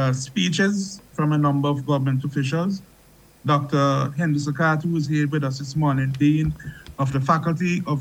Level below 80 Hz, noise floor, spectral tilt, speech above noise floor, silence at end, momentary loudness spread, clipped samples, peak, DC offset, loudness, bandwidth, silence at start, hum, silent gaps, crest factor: -50 dBFS; -52 dBFS; -6.5 dB/octave; 31 dB; 0 s; 7 LU; under 0.1%; -4 dBFS; under 0.1%; -22 LUFS; 11 kHz; 0 s; none; none; 18 dB